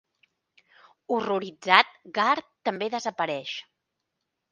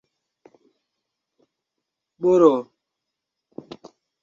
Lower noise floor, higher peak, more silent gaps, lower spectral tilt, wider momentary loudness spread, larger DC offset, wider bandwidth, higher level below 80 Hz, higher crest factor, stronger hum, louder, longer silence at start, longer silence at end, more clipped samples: about the same, -82 dBFS vs -83 dBFS; first, 0 dBFS vs -4 dBFS; neither; second, -3.5 dB/octave vs -7.5 dB/octave; second, 13 LU vs 26 LU; neither; first, 11 kHz vs 7.4 kHz; second, -78 dBFS vs -72 dBFS; first, 28 dB vs 22 dB; neither; second, -25 LUFS vs -18 LUFS; second, 1.1 s vs 2.2 s; second, 0.9 s vs 1.6 s; neither